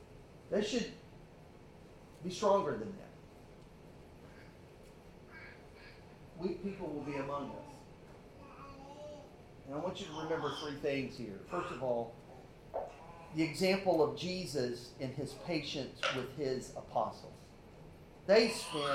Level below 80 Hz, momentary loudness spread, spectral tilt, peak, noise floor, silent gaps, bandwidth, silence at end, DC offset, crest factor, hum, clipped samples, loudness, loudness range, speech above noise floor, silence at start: -64 dBFS; 25 LU; -5 dB/octave; -16 dBFS; -56 dBFS; none; 15.5 kHz; 0 s; under 0.1%; 24 dB; none; under 0.1%; -37 LUFS; 10 LU; 20 dB; 0 s